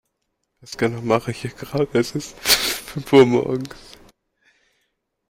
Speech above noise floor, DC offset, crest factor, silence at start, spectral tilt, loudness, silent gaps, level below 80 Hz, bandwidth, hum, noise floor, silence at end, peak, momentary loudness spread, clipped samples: 55 dB; under 0.1%; 20 dB; 0.7 s; -4 dB/octave; -20 LUFS; none; -52 dBFS; 16.5 kHz; none; -75 dBFS; 1.55 s; 0 dBFS; 15 LU; under 0.1%